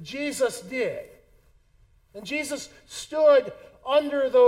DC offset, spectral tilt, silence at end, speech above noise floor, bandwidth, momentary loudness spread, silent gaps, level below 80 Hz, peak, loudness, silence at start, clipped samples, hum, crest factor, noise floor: under 0.1%; -3 dB/octave; 0 s; 36 dB; 15.5 kHz; 20 LU; none; -62 dBFS; -8 dBFS; -25 LUFS; 0 s; under 0.1%; none; 16 dB; -60 dBFS